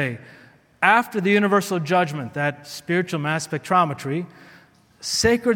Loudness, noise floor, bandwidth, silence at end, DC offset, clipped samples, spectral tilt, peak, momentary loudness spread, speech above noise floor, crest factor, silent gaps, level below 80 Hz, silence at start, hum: -21 LUFS; -52 dBFS; 17.5 kHz; 0 s; under 0.1%; under 0.1%; -4.5 dB/octave; -2 dBFS; 11 LU; 31 dB; 20 dB; none; -52 dBFS; 0 s; none